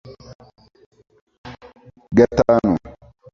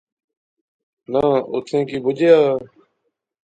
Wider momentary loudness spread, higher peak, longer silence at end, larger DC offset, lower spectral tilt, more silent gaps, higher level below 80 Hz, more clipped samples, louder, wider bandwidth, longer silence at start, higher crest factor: first, 25 LU vs 9 LU; about the same, 0 dBFS vs -2 dBFS; second, 0.4 s vs 0.8 s; neither; about the same, -7.5 dB/octave vs -7 dB/octave; first, 0.35-0.39 s, 0.86-0.91 s, 1.21-1.27 s, 1.38-1.44 s vs none; first, -44 dBFS vs -58 dBFS; neither; about the same, -17 LUFS vs -18 LUFS; second, 7.2 kHz vs 8.8 kHz; second, 0.1 s vs 1.1 s; about the same, 22 dB vs 18 dB